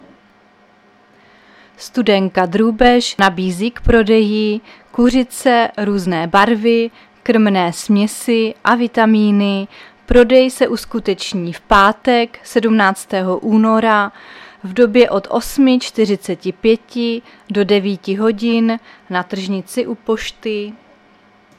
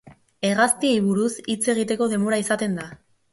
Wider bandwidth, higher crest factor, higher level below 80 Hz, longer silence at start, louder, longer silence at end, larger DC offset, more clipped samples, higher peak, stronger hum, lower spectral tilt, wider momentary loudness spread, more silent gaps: first, 14.5 kHz vs 12 kHz; about the same, 14 dB vs 18 dB; first, -34 dBFS vs -64 dBFS; first, 1.8 s vs 0.05 s; first, -15 LUFS vs -22 LUFS; first, 0.85 s vs 0.35 s; neither; neither; first, 0 dBFS vs -4 dBFS; neither; first, -5.5 dB/octave vs -4 dB/octave; first, 11 LU vs 8 LU; neither